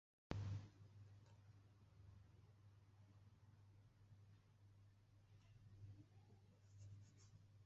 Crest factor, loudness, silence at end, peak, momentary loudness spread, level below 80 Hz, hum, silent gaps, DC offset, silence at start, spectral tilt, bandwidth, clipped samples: 34 dB; -60 LUFS; 0 s; -28 dBFS; 17 LU; -72 dBFS; none; none; under 0.1%; 0.3 s; -7 dB/octave; 7.6 kHz; under 0.1%